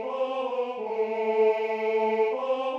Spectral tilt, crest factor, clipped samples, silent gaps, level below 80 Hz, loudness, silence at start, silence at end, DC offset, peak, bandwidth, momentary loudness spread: -5.5 dB/octave; 14 dB; under 0.1%; none; -82 dBFS; -27 LUFS; 0 s; 0 s; under 0.1%; -12 dBFS; 6.8 kHz; 6 LU